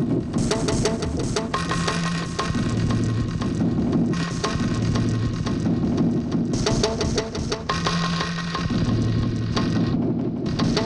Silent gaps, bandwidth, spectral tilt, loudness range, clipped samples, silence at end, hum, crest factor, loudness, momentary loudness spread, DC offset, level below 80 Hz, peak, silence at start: none; 11 kHz; -5.5 dB/octave; 1 LU; under 0.1%; 0 s; none; 18 dB; -23 LUFS; 3 LU; under 0.1%; -36 dBFS; -6 dBFS; 0 s